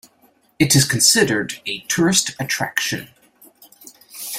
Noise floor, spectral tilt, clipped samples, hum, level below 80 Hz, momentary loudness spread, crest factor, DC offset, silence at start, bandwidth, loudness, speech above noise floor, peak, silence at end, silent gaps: -58 dBFS; -3 dB/octave; under 0.1%; none; -54 dBFS; 14 LU; 20 dB; under 0.1%; 0.6 s; 16.5 kHz; -17 LUFS; 39 dB; 0 dBFS; 0 s; none